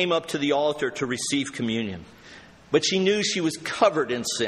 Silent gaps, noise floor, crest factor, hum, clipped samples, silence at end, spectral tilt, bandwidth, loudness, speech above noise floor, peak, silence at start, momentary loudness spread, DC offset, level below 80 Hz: none; -48 dBFS; 18 dB; none; under 0.1%; 0 s; -3.5 dB/octave; 14.5 kHz; -24 LUFS; 23 dB; -6 dBFS; 0 s; 6 LU; under 0.1%; -62 dBFS